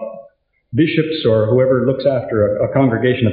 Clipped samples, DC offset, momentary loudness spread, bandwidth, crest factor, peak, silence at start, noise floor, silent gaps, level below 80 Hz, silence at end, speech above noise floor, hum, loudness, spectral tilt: under 0.1%; under 0.1%; 4 LU; 4.9 kHz; 12 dB; -2 dBFS; 0 s; -50 dBFS; none; -50 dBFS; 0 s; 35 dB; none; -16 LUFS; -6.5 dB/octave